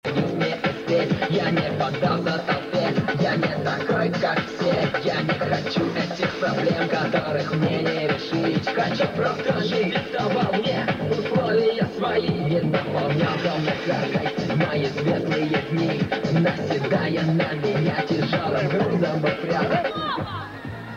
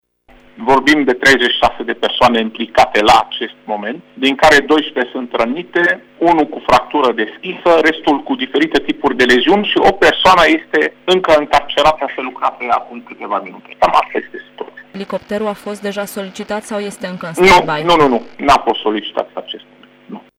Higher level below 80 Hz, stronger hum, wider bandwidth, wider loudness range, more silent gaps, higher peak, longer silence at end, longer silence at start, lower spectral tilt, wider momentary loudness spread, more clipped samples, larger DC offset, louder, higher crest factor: second, -56 dBFS vs -40 dBFS; second, none vs 50 Hz at -60 dBFS; second, 7.6 kHz vs 16.5 kHz; second, 1 LU vs 8 LU; neither; second, -10 dBFS vs -2 dBFS; second, 0 s vs 0.2 s; second, 0.05 s vs 0.55 s; first, -7 dB/octave vs -4 dB/octave; second, 3 LU vs 14 LU; neither; neither; second, -23 LUFS vs -13 LUFS; about the same, 14 dB vs 12 dB